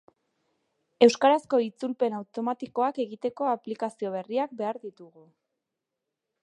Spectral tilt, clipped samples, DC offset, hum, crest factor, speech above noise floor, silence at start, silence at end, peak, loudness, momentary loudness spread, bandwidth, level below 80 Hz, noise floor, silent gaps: -4.5 dB/octave; under 0.1%; under 0.1%; none; 24 dB; 59 dB; 1 s; 1.35 s; -4 dBFS; -27 LUFS; 12 LU; 10.5 kHz; -82 dBFS; -86 dBFS; none